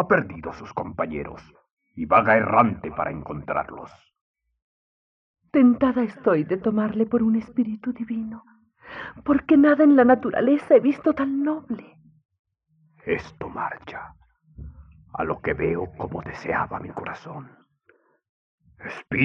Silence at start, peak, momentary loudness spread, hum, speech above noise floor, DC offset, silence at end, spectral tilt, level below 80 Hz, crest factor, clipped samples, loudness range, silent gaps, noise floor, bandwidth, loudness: 0 s; -2 dBFS; 20 LU; none; 42 dB; under 0.1%; 0 s; -8.5 dB/octave; -54 dBFS; 22 dB; under 0.1%; 13 LU; 1.71-1.77 s, 4.21-4.34 s, 4.62-5.34 s, 12.25-12.29 s, 12.39-12.44 s, 18.29-18.58 s; -64 dBFS; 6.2 kHz; -22 LUFS